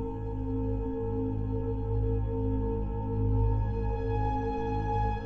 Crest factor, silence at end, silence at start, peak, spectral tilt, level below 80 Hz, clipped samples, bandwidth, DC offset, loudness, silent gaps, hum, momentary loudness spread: 12 dB; 0 s; 0 s; -18 dBFS; -10.5 dB/octave; -34 dBFS; under 0.1%; 4.4 kHz; under 0.1%; -31 LUFS; none; none; 4 LU